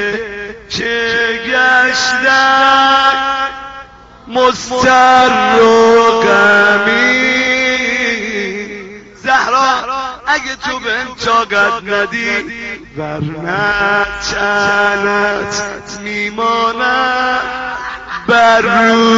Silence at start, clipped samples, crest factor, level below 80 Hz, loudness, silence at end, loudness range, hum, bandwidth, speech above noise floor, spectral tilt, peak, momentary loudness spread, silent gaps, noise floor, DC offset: 0 s; under 0.1%; 12 dB; -42 dBFS; -11 LUFS; 0 s; 6 LU; none; 8 kHz; 24 dB; -1 dB/octave; 0 dBFS; 14 LU; none; -35 dBFS; under 0.1%